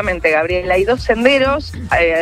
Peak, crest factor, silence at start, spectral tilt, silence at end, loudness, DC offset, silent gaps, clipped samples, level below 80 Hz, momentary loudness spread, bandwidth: 0 dBFS; 14 dB; 0 s; -5.5 dB/octave; 0 s; -15 LUFS; under 0.1%; none; under 0.1%; -32 dBFS; 5 LU; 14 kHz